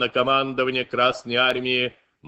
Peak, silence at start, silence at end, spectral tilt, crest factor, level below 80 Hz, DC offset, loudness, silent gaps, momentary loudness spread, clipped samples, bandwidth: -6 dBFS; 0 s; 0 s; -4.5 dB/octave; 16 dB; -62 dBFS; under 0.1%; -21 LUFS; none; 4 LU; under 0.1%; 8.4 kHz